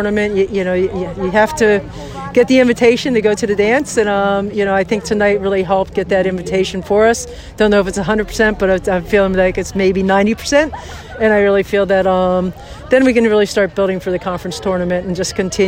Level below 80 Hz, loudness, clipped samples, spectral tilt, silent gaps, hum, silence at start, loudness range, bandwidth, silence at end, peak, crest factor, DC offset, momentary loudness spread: -36 dBFS; -14 LUFS; under 0.1%; -5 dB/octave; none; none; 0 s; 2 LU; 16.5 kHz; 0 s; 0 dBFS; 14 dB; under 0.1%; 7 LU